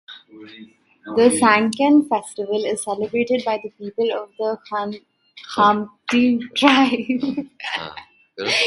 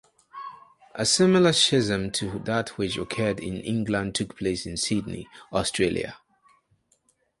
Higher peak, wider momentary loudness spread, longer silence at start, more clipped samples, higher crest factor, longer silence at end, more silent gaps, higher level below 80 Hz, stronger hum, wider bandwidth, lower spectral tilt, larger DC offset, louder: first, 0 dBFS vs -8 dBFS; second, 13 LU vs 20 LU; second, 0.1 s vs 0.35 s; neither; about the same, 20 dB vs 18 dB; second, 0 s vs 1.25 s; neither; second, -64 dBFS vs -52 dBFS; neither; about the same, 11.5 kHz vs 11.5 kHz; about the same, -3.5 dB/octave vs -4 dB/octave; neither; first, -19 LUFS vs -24 LUFS